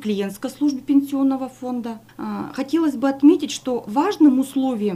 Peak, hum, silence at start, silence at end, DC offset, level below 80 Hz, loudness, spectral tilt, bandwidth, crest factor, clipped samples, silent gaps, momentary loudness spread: -4 dBFS; none; 0 s; 0 s; under 0.1%; -62 dBFS; -20 LUFS; -5.5 dB/octave; 14.5 kHz; 16 dB; under 0.1%; none; 13 LU